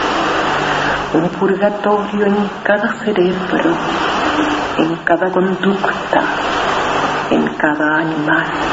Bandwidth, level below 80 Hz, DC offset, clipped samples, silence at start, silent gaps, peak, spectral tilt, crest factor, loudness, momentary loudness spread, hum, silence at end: 8 kHz; -44 dBFS; under 0.1%; under 0.1%; 0 s; none; 0 dBFS; -5.5 dB/octave; 16 dB; -15 LUFS; 2 LU; none; 0 s